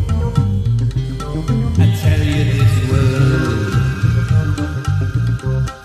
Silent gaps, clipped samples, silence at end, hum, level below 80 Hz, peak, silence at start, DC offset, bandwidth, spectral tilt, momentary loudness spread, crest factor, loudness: none; under 0.1%; 0 s; none; -26 dBFS; 0 dBFS; 0 s; under 0.1%; 13.5 kHz; -7 dB/octave; 6 LU; 14 dB; -16 LUFS